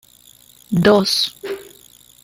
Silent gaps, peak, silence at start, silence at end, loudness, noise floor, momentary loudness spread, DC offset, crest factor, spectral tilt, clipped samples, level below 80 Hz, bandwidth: none; -2 dBFS; 0.7 s; 0.6 s; -16 LUFS; -49 dBFS; 17 LU; under 0.1%; 18 dB; -4.5 dB/octave; under 0.1%; -52 dBFS; 16.5 kHz